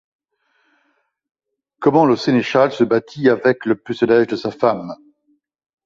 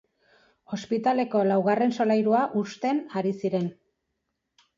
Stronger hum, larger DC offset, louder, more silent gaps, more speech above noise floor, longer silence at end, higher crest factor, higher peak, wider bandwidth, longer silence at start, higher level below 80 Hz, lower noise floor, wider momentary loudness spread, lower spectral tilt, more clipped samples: neither; neither; first, -17 LUFS vs -25 LUFS; neither; second, 51 dB vs 55 dB; second, 0.9 s vs 1.05 s; about the same, 16 dB vs 16 dB; first, -2 dBFS vs -12 dBFS; about the same, 7.4 kHz vs 7.4 kHz; first, 1.8 s vs 0.7 s; first, -60 dBFS vs -74 dBFS; second, -67 dBFS vs -80 dBFS; about the same, 7 LU vs 8 LU; about the same, -7 dB/octave vs -7 dB/octave; neither